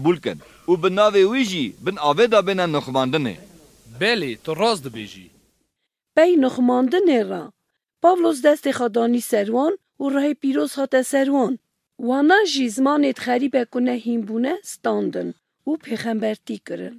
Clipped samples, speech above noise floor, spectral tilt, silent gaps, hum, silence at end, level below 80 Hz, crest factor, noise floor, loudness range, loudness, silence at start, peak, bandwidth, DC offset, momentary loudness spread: under 0.1%; 58 dB; -5 dB/octave; none; none; 0 s; -64 dBFS; 18 dB; -78 dBFS; 4 LU; -20 LUFS; 0 s; -2 dBFS; 15.5 kHz; under 0.1%; 13 LU